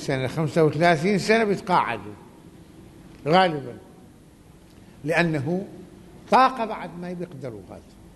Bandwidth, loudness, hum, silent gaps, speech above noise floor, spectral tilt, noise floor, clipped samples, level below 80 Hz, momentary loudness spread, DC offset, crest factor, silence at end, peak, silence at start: 12 kHz; -22 LUFS; none; none; 27 dB; -6 dB/octave; -50 dBFS; under 0.1%; -56 dBFS; 21 LU; under 0.1%; 20 dB; 0.35 s; -4 dBFS; 0 s